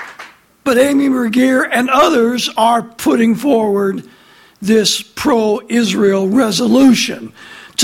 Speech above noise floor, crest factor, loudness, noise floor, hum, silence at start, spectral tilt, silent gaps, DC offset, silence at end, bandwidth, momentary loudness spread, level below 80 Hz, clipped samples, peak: 25 dB; 14 dB; -13 LUFS; -38 dBFS; none; 0 s; -4 dB/octave; none; under 0.1%; 0 s; 16.5 kHz; 10 LU; -52 dBFS; under 0.1%; 0 dBFS